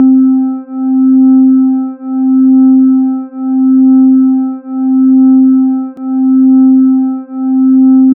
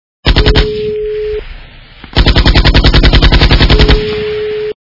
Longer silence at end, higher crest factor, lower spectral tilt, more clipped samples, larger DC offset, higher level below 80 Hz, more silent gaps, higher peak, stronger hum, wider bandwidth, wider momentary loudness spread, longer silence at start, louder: about the same, 0.05 s vs 0.1 s; about the same, 6 dB vs 8 dB; first, -8 dB/octave vs -6.5 dB/octave; second, under 0.1% vs 2%; neither; second, -76 dBFS vs -12 dBFS; neither; about the same, -2 dBFS vs 0 dBFS; neither; second, 1.7 kHz vs 6 kHz; about the same, 10 LU vs 9 LU; second, 0 s vs 0.25 s; about the same, -8 LUFS vs -9 LUFS